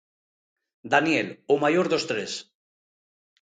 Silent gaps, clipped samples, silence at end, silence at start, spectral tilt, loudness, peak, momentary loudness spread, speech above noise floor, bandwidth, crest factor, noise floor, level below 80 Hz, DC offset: none; under 0.1%; 1 s; 0.85 s; -4.5 dB/octave; -24 LUFS; -4 dBFS; 10 LU; over 66 dB; 9.4 kHz; 22 dB; under -90 dBFS; -72 dBFS; under 0.1%